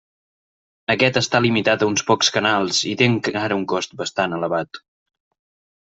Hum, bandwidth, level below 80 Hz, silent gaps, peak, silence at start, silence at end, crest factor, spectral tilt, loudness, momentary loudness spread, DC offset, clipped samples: none; 8.2 kHz; -60 dBFS; none; -2 dBFS; 0.9 s; 1.1 s; 20 dB; -3.5 dB/octave; -19 LUFS; 8 LU; under 0.1%; under 0.1%